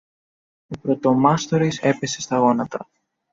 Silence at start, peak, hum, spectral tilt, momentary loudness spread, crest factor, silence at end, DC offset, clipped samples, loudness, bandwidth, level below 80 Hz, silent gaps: 0.7 s; -4 dBFS; none; -5.5 dB/octave; 13 LU; 18 dB; 0.5 s; under 0.1%; under 0.1%; -20 LUFS; 7.8 kHz; -58 dBFS; none